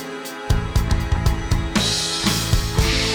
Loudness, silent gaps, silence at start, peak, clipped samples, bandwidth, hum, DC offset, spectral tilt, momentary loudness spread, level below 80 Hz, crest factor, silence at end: -21 LUFS; none; 0 s; -6 dBFS; under 0.1%; over 20 kHz; none; under 0.1%; -4 dB/octave; 5 LU; -24 dBFS; 14 dB; 0 s